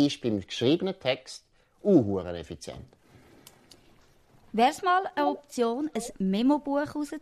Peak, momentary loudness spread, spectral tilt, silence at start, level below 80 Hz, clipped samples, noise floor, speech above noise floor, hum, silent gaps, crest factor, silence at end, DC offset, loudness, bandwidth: -10 dBFS; 17 LU; -5.5 dB/octave; 0 s; -60 dBFS; under 0.1%; -59 dBFS; 32 dB; none; none; 18 dB; 0 s; under 0.1%; -27 LUFS; 14 kHz